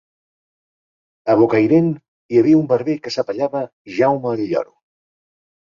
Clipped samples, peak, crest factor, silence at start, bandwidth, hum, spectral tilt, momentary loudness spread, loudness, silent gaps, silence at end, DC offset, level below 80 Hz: under 0.1%; -2 dBFS; 16 dB; 1.25 s; 7.2 kHz; none; -7.5 dB/octave; 13 LU; -18 LUFS; 2.08-2.29 s, 3.73-3.85 s; 1.1 s; under 0.1%; -60 dBFS